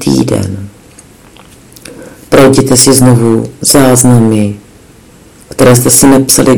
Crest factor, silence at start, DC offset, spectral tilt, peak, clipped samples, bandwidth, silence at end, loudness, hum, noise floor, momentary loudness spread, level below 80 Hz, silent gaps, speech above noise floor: 8 dB; 0 s; under 0.1%; -4.5 dB/octave; 0 dBFS; 9%; over 20 kHz; 0 s; -6 LUFS; none; -37 dBFS; 12 LU; -34 dBFS; none; 31 dB